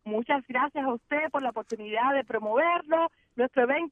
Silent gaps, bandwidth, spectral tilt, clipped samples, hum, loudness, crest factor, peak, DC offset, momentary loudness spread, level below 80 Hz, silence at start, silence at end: none; 8.6 kHz; -5.5 dB/octave; under 0.1%; none; -28 LUFS; 16 dB; -12 dBFS; under 0.1%; 7 LU; -74 dBFS; 0.05 s; 0 s